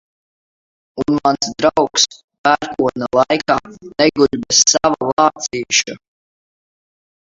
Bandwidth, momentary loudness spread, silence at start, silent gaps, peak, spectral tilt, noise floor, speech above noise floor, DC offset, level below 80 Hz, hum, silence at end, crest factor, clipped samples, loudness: 7.8 kHz; 8 LU; 0.95 s; 2.24-2.28 s, 2.38-2.44 s, 5.13-5.17 s; 0 dBFS; -2 dB/octave; under -90 dBFS; over 74 dB; under 0.1%; -50 dBFS; none; 1.4 s; 18 dB; under 0.1%; -15 LUFS